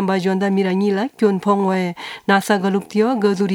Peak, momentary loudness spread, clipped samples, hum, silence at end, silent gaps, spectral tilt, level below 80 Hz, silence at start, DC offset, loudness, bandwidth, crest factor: 0 dBFS; 4 LU; under 0.1%; none; 0 s; none; -6.5 dB/octave; -68 dBFS; 0 s; under 0.1%; -18 LUFS; 16.5 kHz; 18 dB